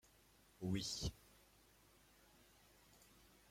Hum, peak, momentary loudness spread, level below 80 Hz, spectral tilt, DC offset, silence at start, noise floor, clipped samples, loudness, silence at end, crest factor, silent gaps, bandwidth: none; -30 dBFS; 26 LU; -64 dBFS; -4 dB/octave; under 0.1%; 0.6 s; -71 dBFS; under 0.1%; -45 LUFS; 0.55 s; 22 dB; none; 16.5 kHz